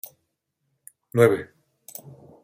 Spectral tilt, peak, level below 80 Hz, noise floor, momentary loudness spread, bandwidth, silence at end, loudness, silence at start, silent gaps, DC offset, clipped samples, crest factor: -6.5 dB/octave; -4 dBFS; -66 dBFS; -77 dBFS; 23 LU; 16.5 kHz; 1 s; -21 LUFS; 1.15 s; none; under 0.1%; under 0.1%; 22 dB